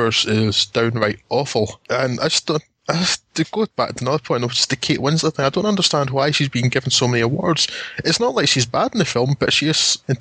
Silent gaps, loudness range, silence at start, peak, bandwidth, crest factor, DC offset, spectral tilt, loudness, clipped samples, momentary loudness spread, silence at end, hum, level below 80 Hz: none; 3 LU; 0 s; -2 dBFS; 9.6 kHz; 18 dB; under 0.1%; -4 dB/octave; -18 LUFS; under 0.1%; 6 LU; 0 s; none; -52 dBFS